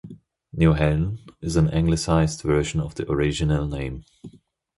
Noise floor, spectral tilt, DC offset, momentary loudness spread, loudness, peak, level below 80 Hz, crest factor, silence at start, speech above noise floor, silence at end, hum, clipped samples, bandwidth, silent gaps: -44 dBFS; -6.5 dB/octave; under 0.1%; 11 LU; -23 LUFS; -6 dBFS; -34 dBFS; 18 dB; 0.05 s; 22 dB; 0.5 s; none; under 0.1%; 11.5 kHz; none